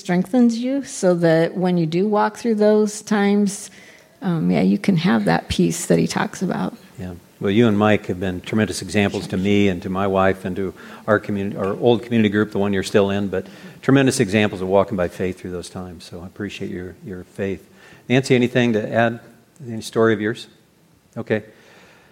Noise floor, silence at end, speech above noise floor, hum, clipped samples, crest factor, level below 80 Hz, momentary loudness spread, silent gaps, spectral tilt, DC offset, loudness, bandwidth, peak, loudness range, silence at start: -55 dBFS; 0.65 s; 36 dB; none; under 0.1%; 18 dB; -52 dBFS; 16 LU; none; -6 dB/octave; under 0.1%; -20 LUFS; 16 kHz; -2 dBFS; 5 LU; 0.05 s